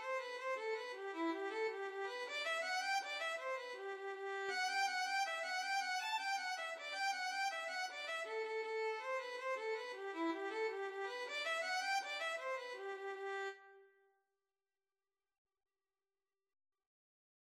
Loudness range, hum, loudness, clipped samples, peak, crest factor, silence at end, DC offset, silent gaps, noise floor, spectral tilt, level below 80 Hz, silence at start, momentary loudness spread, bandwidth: 7 LU; none; -41 LUFS; under 0.1%; -28 dBFS; 16 dB; 3.6 s; under 0.1%; none; under -90 dBFS; 1 dB/octave; under -90 dBFS; 0 s; 7 LU; 16 kHz